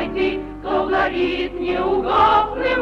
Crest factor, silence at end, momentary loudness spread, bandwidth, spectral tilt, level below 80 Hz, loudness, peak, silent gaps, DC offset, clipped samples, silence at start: 14 dB; 0 s; 8 LU; 7 kHz; -6.5 dB/octave; -38 dBFS; -19 LUFS; -4 dBFS; none; under 0.1%; under 0.1%; 0 s